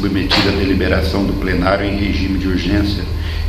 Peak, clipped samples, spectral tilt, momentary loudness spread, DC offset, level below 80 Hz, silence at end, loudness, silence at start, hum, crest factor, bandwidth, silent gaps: 0 dBFS; under 0.1%; -6.5 dB/octave; 4 LU; under 0.1%; -22 dBFS; 0 s; -16 LUFS; 0 s; none; 16 dB; 14 kHz; none